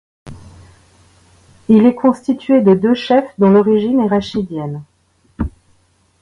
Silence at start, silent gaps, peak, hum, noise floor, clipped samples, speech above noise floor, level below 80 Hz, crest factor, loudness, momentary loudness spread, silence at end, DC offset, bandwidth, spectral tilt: 0.25 s; none; 0 dBFS; none; -56 dBFS; under 0.1%; 43 dB; -40 dBFS; 16 dB; -14 LUFS; 15 LU; 0.75 s; under 0.1%; 10.5 kHz; -8 dB/octave